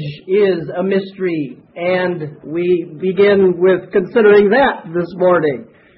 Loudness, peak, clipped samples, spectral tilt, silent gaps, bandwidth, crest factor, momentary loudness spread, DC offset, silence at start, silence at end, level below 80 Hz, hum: -15 LUFS; 0 dBFS; under 0.1%; -11.5 dB/octave; none; 5.6 kHz; 14 dB; 12 LU; under 0.1%; 0 s; 0.35 s; -54 dBFS; none